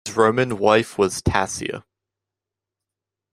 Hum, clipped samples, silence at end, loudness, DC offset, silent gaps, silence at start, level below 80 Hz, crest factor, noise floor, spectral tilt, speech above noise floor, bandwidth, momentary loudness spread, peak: none; under 0.1%; 1.5 s; -20 LUFS; under 0.1%; none; 0.05 s; -44 dBFS; 20 dB; -87 dBFS; -4.5 dB/octave; 67 dB; 13.5 kHz; 11 LU; -2 dBFS